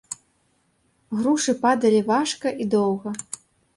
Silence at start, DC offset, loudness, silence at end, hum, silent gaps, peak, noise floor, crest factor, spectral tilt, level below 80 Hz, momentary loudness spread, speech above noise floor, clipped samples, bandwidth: 0.1 s; under 0.1%; -22 LUFS; 0.55 s; none; none; -8 dBFS; -66 dBFS; 16 dB; -4.5 dB/octave; -66 dBFS; 18 LU; 45 dB; under 0.1%; 11.5 kHz